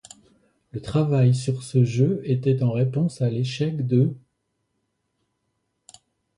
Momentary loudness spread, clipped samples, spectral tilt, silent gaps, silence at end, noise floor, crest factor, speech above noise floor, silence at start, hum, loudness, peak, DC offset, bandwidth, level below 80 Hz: 6 LU; under 0.1%; -8 dB/octave; none; 2.2 s; -75 dBFS; 16 dB; 54 dB; 0.75 s; none; -23 LUFS; -8 dBFS; under 0.1%; 11 kHz; -56 dBFS